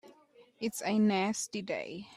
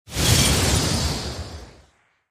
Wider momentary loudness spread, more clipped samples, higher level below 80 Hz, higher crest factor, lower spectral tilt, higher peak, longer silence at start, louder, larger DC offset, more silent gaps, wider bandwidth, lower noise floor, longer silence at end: second, 10 LU vs 19 LU; neither; second, -76 dBFS vs -32 dBFS; second, 14 dB vs 20 dB; first, -4.5 dB/octave vs -3 dB/octave; second, -20 dBFS vs -4 dBFS; about the same, 0.05 s vs 0.1 s; second, -32 LUFS vs -19 LUFS; neither; neither; second, 14 kHz vs 15.5 kHz; about the same, -61 dBFS vs -59 dBFS; second, 0 s vs 0.6 s